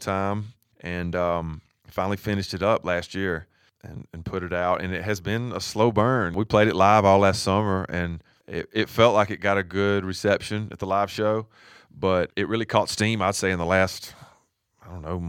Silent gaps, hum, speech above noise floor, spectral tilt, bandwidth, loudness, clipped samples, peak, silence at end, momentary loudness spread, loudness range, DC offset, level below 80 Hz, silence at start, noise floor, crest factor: none; none; 40 dB; -5.5 dB/octave; 17 kHz; -24 LUFS; under 0.1%; -4 dBFS; 0 s; 16 LU; 6 LU; under 0.1%; -50 dBFS; 0 s; -64 dBFS; 20 dB